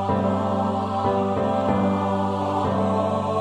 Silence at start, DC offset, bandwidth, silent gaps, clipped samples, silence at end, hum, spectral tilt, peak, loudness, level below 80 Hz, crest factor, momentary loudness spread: 0 s; under 0.1%; 9.6 kHz; none; under 0.1%; 0 s; none; -8 dB/octave; -8 dBFS; -23 LUFS; -52 dBFS; 14 dB; 2 LU